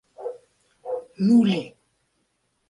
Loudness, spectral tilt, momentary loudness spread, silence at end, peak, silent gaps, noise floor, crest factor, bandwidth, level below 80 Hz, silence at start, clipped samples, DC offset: -22 LUFS; -7.5 dB/octave; 22 LU; 1 s; -8 dBFS; none; -72 dBFS; 18 dB; 10.5 kHz; -70 dBFS; 0.2 s; under 0.1%; under 0.1%